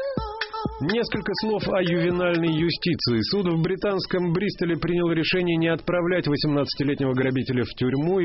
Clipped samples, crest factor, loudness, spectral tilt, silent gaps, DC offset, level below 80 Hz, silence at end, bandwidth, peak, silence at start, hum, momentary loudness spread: under 0.1%; 12 dB; -24 LUFS; -5 dB/octave; none; under 0.1%; -46 dBFS; 0 s; 6 kHz; -10 dBFS; 0 s; none; 4 LU